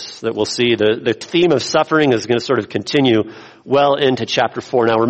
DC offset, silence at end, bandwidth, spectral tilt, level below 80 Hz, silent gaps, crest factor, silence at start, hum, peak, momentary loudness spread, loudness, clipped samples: under 0.1%; 0 s; 8.8 kHz; -5 dB/octave; -56 dBFS; none; 14 dB; 0 s; none; -2 dBFS; 5 LU; -16 LUFS; under 0.1%